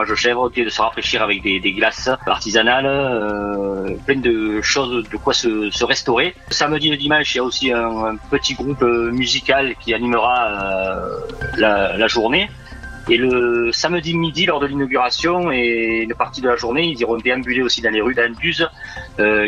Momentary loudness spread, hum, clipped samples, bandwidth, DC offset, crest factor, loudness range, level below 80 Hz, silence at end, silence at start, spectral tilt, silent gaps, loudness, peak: 6 LU; none; under 0.1%; 9 kHz; under 0.1%; 18 dB; 1 LU; -40 dBFS; 0 s; 0 s; -3.5 dB/octave; none; -17 LUFS; 0 dBFS